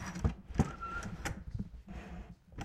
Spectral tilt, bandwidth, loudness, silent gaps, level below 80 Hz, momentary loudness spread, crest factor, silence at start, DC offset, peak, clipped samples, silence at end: -6 dB/octave; 15 kHz; -40 LUFS; none; -44 dBFS; 14 LU; 24 dB; 0 s; under 0.1%; -16 dBFS; under 0.1%; 0 s